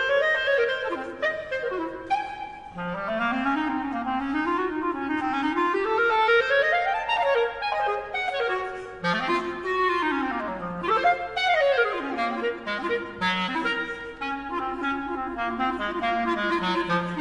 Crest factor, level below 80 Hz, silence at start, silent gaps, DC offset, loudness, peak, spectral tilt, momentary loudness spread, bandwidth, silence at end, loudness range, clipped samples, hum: 16 dB; -54 dBFS; 0 s; none; under 0.1%; -25 LUFS; -10 dBFS; -5 dB/octave; 9 LU; 10.5 kHz; 0 s; 5 LU; under 0.1%; none